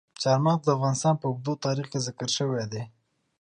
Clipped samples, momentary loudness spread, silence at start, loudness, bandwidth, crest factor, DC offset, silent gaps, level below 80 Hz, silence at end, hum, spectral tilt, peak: under 0.1%; 9 LU; 0.2 s; -26 LUFS; 10 kHz; 18 dB; under 0.1%; none; -68 dBFS; 0.55 s; none; -5.5 dB/octave; -10 dBFS